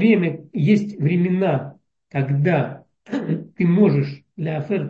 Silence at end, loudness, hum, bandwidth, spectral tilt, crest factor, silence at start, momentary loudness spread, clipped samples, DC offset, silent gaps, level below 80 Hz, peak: 0 s; -21 LUFS; none; 7 kHz; -9.5 dB/octave; 14 dB; 0 s; 12 LU; under 0.1%; under 0.1%; none; -64 dBFS; -4 dBFS